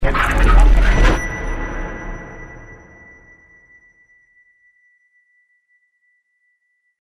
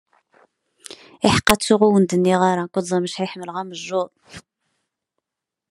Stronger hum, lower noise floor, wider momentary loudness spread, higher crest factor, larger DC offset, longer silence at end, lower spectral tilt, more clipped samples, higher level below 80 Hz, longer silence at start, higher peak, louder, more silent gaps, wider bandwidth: neither; second, -67 dBFS vs -85 dBFS; first, 27 LU vs 15 LU; about the same, 18 dB vs 22 dB; neither; first, 4.25 s vs 1.3 s; about the same, -5.5 dB/octave vs -5 dB/octave; neither; first, -20 dBFS vs -48 dBFS; second, 0 s vs 0.9 s; about the same, 0 dBFS vs 0 dBFS; about the same, -18 LUFS vs -19 LUFS; neither; second, 10.5 kHz vs 13 kHz